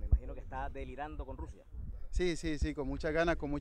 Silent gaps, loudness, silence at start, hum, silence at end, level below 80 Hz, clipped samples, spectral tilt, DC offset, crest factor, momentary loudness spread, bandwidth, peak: none; -37 LUFS; 0 s; none; 0 s; -38 dBFS; under 0.1%; -6.5 dB/octave; under 0.1%; 20 dB; 15 LU; 10 kHz; -16 dBFS